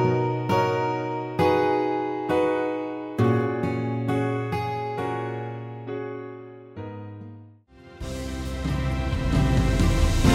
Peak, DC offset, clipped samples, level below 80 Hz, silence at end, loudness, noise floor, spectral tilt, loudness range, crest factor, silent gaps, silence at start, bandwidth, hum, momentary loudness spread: -6 dBFS; under 0.1%; under 0.1%; -32 dBFS; 0 s; -25 LUFS; -49 dBFS; -7 dB/octave; 10 LU; 18 dB; none; 0 s; 15.5 kHz; none; 16 LU